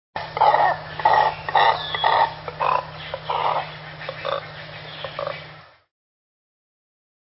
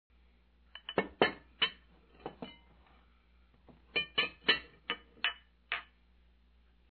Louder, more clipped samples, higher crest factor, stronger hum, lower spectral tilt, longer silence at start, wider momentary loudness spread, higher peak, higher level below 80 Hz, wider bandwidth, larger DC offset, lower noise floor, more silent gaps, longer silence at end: first, -21 LUFS vs -34 LUFS; neither; second, 20 dB vs 28 dB; neither; first, -7.5 dB/octave vs -5.5 dB/octave; second, 0.15 s vs 0.75 s; second, 16 LU vs 20 LU; first, -4 dBFS vs -12 dBFS; first, -54 dBFS vs -64 dBFS; first, 5.8 kHz vs 4.7 kHz; neither; second, -44 dBFS vs -66 dBFS; neither; first, 1.7 s vs 1.15 s